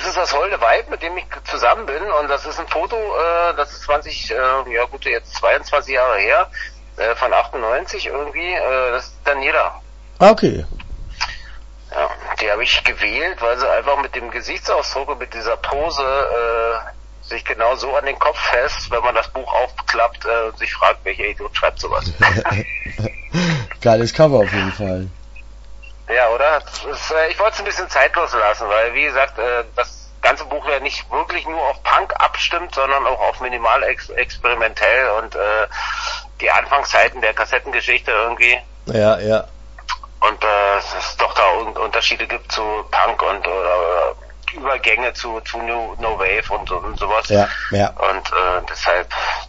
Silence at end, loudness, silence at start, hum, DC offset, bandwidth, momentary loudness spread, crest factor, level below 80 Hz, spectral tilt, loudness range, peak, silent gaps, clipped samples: 0 s; -17 LUFS; 0 s; none; under 0.1%; 8 kHz; 10 LU; 18 dB; -36 dBFS; -4 dB/octave; 3 LU; 0 dBFS; none; under 0.1%